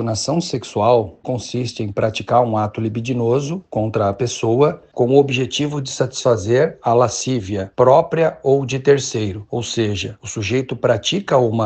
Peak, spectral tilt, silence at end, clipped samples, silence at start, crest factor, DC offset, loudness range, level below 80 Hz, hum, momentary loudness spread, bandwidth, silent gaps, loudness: 0 dBFS; -5.5 dB/octave; 0 s; under 0.1%; 0 s; 18 dB; under 0.1%; 3 LU; -52 dBFS; none; 9 LU; 9 kHz; none; -18 LUFS